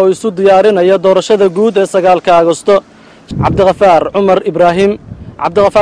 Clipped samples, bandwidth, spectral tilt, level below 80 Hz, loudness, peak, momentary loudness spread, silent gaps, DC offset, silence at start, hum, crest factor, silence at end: under 0.1%; 11 kHz; -6 dB/octave; -38 dBFS; -9 LUFS; 0 dBFS; 7 LU; none; under 0.1%; 0 s; none; 8 dB; 0 s